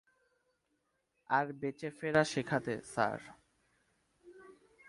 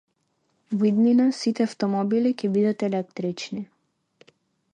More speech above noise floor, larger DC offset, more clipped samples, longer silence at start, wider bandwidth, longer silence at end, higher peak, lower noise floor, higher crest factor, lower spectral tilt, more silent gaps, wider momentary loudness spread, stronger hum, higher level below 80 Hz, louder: about the same, 46 dB vs 49 dB; neither; neither; first, 1.3 s vs 0.7 s; first, 11.5 kHz vs 9.8 kHz; second, 0.35 s vs 1.1 s; second, -14 dBFS vs -10 dBFS; first, -81 dBFS vs -71 dBFS; first, 24 dB vs 14 dB; second, -5 dB/octave vs -6.5 dB/octave; neither; second, 9 LU vs 13 LU; neither; about the same, -72 dBFS vs -74 dBFS; second, -35 LUFS vs -23 LUFS